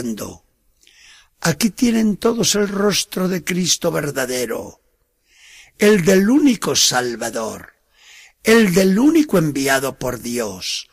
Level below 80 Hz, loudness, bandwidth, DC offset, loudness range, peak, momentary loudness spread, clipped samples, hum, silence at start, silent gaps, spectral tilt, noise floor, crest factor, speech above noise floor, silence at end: -48 dBFS; -17 LUFS; 15.5 kHz; under 0.1%; 3 LU; -4 dBFS; 12 LU; under 0.1%; none; 0 s; none; -4 dB/octave; -64 dBFS; 16 dB; 47 dB; 0.1 s